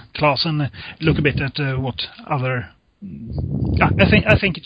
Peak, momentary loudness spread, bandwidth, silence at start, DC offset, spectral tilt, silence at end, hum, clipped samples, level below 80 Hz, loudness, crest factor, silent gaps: 0 dBFS; 14 LU; 5.2 kHz; 0.15 s; under 0.1%; -8.5 dB/octave; 0.05 s; none; under 0.1%; -32 dBFS; -19 LUFS; 18 dB; none